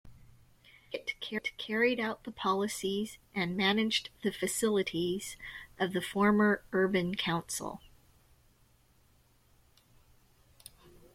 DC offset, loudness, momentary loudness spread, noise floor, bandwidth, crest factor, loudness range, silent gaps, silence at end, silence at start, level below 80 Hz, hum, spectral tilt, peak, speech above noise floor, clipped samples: under 0.1%; -32 LUFS; 13 LU; -66 dBFS; 16 kHz; 18 dB; 7 LU; none; 3.25 s; 0.05 s; -64 dBFS; none; -4 dB/octave; -16 dBFS; 34 dB; under 0.1%